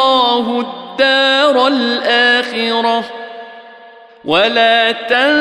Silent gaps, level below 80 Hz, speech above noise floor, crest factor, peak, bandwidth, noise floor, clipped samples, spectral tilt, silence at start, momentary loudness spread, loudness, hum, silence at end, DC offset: none; -60 dBFS; 26 dB; 12 dB; -2 dBFS; 12 kHz; -39 dBFS; under 0.1%; -3 dB/octave; 0 s; 15 LU; -12 LUFS; none; 0 s; under 0.1%